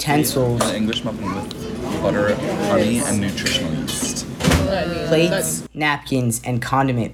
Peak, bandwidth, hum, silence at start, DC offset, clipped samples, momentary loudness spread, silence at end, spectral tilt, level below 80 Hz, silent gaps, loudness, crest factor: -2 dBFS; 19.5 kHz; none; 0 s; under 0.1%; under 0.1%; 7 LU; 0 s; -4.5 dB/octave; -38 dBFS; none; -20 LUFS; 16 dB